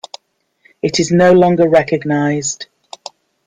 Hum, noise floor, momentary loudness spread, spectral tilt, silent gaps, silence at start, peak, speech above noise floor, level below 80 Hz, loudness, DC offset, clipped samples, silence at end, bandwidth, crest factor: none; -58 dBFS; 23 LU; -5 dB/octave; none; 0.85 s; 0 dBFS; 46 dB; -52 dBFS; -13 LUFS; under 0.1%; under 0.1%; 0.85 s; 9.6 kHz; 14 dB